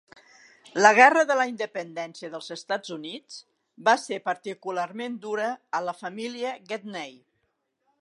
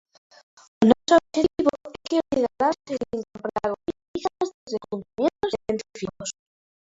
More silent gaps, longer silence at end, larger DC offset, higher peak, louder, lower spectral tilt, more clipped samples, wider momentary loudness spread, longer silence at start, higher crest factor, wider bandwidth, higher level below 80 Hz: second, none vs 4.08-4.14 s, 4.54-4.67 s; first, 0.9 s vs 0.65 s; neither; about the same, -2 dBFS vs -2 dBFS; about the same, -25 LUFS vs -25 LUFS; second, -3 dB/octave vs -5 dB/octave; neither; first, 20 LU vs 13 LU; about the same, 0.75 s vs 0.8 s; about the same, 24 dB vs 24 dB; first, 11.5 kHz vs 8 kHz; second, -84 dBFS vs -56 dBFS